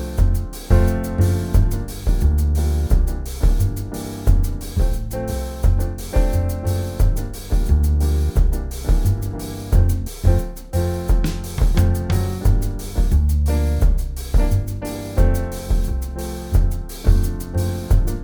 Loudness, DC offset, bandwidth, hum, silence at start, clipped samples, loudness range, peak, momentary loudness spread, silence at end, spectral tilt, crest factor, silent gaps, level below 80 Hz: -21 LUFS; under 0.1%; over 20 kHz; none; 0 s; under 0.1%; 2 LU; 0 dBFS; 7 LU; 0 s; -7 dB/octave; 16 dB; none; -18 dBFS